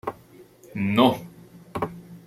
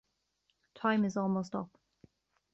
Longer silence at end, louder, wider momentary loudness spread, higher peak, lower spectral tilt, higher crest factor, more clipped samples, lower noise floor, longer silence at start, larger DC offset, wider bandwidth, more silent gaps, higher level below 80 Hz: second, 0.1 s vs 0.85 s; first, -24 LUFS vs -33 LUFS; first, 18 LU vs 11 LU; first, -4 dBFS vs -18 dBFS; about the same, -6.5 dB/octave vs -6 dB/octave; about the same, 22 dB vs 18 dB; neither; second, -50 dBFS vs -79 dBFS; second, 0.05 s vs 0.75 s; neither; first, 15.5 kHz vs 7.8 kHz; neither; first, -60 dBFS vs -74 dBFS